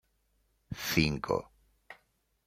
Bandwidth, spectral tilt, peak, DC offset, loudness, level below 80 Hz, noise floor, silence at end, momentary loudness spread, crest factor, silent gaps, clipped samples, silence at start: 16 kHz; -4.5 dB/octave; -10 dBFS; under 0.1%; -31 LUFS; -54 dBFS; -74 dBFS; 0.55 s; 11 LU; 26 dB; none; under 0.1%; 0.7 s